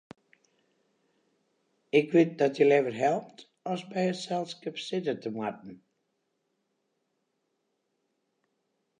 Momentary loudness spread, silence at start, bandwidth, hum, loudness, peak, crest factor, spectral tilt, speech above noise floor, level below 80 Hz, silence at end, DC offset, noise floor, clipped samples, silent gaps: 13 LU; 1.95 s; 9.8 kHz; none; -28 LUFS; -10 dBFS; 22 dB; -6 dB/octave; 51 dB; -84 dBFS; 3.25 s; under 0.1%; -79 dBFS; under 0.1%; none